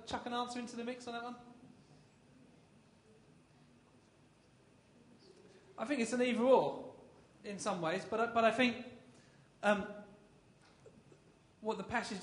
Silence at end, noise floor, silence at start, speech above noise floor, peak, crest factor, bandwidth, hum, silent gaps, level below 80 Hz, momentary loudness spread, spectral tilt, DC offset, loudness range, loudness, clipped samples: 0 s; -66 dBFS; 0 s; 31 dB; -16 dBFS; 24 dB; 10.5 kHz; none; none; -74 dBFS; 23 LU; -4.5 dB/octave; under 0.1%; 15 LU; -36 LUFS; under 0.1%